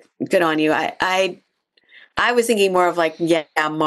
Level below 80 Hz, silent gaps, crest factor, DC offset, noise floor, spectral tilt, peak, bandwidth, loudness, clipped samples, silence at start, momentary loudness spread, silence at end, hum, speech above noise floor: -58 dBFS; none; 14 dB; under 0.1%; -58 dBFS; -4 dB/octave; -6 dBFS; 12.5 kHz; -18 LUFS; under 0.1%; 0.2 s; 5 LU; 0 s; none; 40 dB